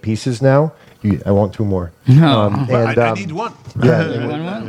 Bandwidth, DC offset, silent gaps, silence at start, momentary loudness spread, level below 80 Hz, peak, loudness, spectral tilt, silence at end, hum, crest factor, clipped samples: 10.5 kHz; under 0.1%; none; 0.05 s; 11 LU; -46 dBFS; 0 dBFS; -15 LUFS; -7.5 dB/octave; 0 s; none; 14 dB; under 0.1%